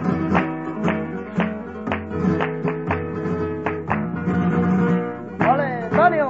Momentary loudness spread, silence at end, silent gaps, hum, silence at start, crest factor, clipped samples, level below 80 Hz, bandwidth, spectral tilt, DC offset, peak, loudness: 7 LU; 0 s; none; none; 0 s; 20 dB; under 0.1%; -48 dBFS; 7.2 kHz; -9 dB/octave; 0.2%; -2 dBFS; -22 LUFS